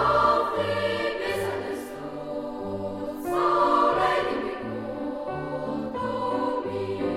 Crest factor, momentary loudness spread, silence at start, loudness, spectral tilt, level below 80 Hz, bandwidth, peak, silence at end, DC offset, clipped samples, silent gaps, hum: 18 dB; 12 LU; 0 s; -27 LUFS; -5.5 dB/octave; -52 dBFS; 16 kHz; -8 dBFS; 0 s; under 0.1%; under 0.1%; none; none